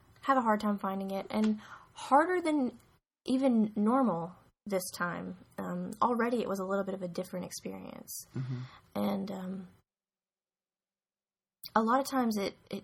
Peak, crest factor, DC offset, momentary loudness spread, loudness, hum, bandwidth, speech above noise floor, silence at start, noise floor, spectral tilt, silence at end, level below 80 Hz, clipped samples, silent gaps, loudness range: -14 dBFS; 20 dB; under 0.1%; 15 LU; -32 LUFS; none; 18 kHz; over 58 dB; 0.25 s; under -90 dBFS; -5.5 dB/octave; 0.05 s; -72 dBFS; under 0.1%; none; 10 LU